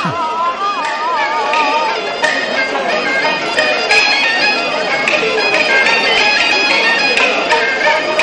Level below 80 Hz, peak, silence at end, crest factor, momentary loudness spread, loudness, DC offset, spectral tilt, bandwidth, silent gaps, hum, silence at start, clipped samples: -52 dBFS; -2 dBFS; 0 s; 12 dB; 6 LU; -12 LUFS; under 0.1%; -2 dB/octave; 10.5 kHz; none; none; 0 s; under 0.1%